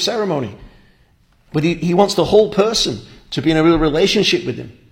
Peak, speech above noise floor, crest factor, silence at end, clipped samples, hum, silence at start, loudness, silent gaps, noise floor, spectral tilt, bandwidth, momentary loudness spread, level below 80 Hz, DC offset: 0 dBFS; 39 dB; 16 dB; 0.2 s; under 0.1%; none; 0 s; -16 LUFS; none; -54 dBFS; -5 dB/octave; 16.5 kHz; 13 LU; -38 dBFS; under 0.1%